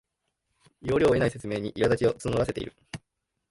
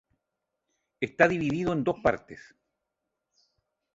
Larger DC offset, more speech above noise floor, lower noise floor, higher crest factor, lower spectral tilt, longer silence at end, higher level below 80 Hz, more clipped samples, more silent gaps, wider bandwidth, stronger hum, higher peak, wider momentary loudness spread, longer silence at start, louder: neither; second, 53 dB vs 57 dB; second, -79 dBFS vs -84 dBFS; second, 16 dB vs 24 dB; about the same, -6.5 dB/octave vs -7 dB/octave; second, 0.55 s vs 1.55 s; first, -50 dBFS vs -58 dBFS; neither; neither; first, 11.5 kHz vs 7.8 kHz; neither; second, -12 dBFS vs -6 dBFS; about the same, 19 LU vs 18 LU; second, 0.85 s vs 1 s; about the same, -26 LUFS vs -27 LUFS